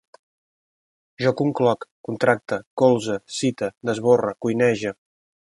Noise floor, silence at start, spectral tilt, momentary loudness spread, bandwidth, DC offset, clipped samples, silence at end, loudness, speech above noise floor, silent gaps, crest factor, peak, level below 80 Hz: under -90 dBFS; 1.2 s; -5.5 dB/octave; 9 LU; 11.5 kHz; under 0.1%; under 0.1%; 0.6 s; -22 LUFS; over 69 dB; 1.91-2.04 s, 2.66-2.77 s, 3.77-3.81 s; 20 dB; -2 dBFS; -62 dBFS